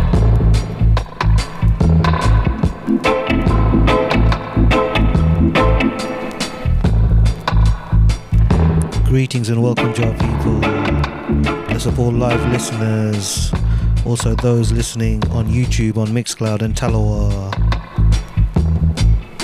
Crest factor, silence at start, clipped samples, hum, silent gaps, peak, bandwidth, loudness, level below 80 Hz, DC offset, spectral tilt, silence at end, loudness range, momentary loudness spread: 12 dB; 0 s; under 0.1%; none; none; -2 dBFS; 13 kHz; -16 LUFS; -18 dBFS; under 0.1%; -6.5 dB/octave; 0 s; 3 LU; 5 LU